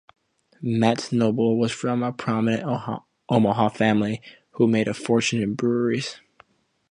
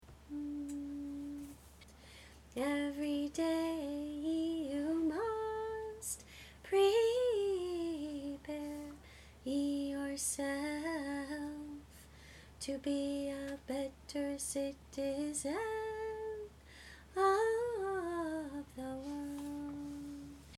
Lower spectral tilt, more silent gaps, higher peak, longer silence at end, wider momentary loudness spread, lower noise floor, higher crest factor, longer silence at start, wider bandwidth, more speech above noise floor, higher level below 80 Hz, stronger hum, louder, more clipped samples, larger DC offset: first, -6 dB/octave vs -4 dB/octave; neither; first, -4 dBFS vs -20 dBFS; first, 0.75 s vs 0 s; second, 9 LU vs 19 LU; about the same, -58 dBFS vs -58 dBFS; about the same, 20 dB vs 18 dB; first, 0.6 s vs 0 s; second, 10.5 kHz vs 16.5 kHz; first, 36 dB vs 20 dB; about the same, -60 dBFS vs -62 dBFS; neither; first, -23 LUFS vs -38 LUFS; neither; neither